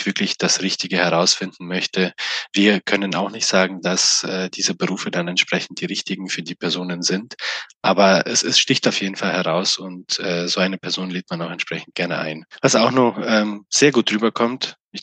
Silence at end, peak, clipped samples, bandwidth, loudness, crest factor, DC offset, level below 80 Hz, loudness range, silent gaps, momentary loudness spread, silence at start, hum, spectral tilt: 0 s; -2 dBFS; under 0.1%; 9.8 kHz; -19 LUFS; 18 dB; under 0.1%; -68 dBFS; 4 LU; 7.75-7.81 s, 14.81-14.91 s; 10 LU; 0 s; none; -3 dB/octave